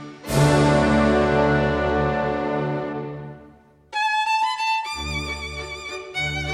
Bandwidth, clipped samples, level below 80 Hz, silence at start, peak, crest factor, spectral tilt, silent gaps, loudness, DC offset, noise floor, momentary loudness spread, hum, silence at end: 15 kHz; under 0.1%; -38 dBFS; 0 s; -6 dBFS; 16 dB; -5.5 dB/octave; none; -22 LUFS; under 0.1%; -50 dBFS; 13 LU; none; 0 s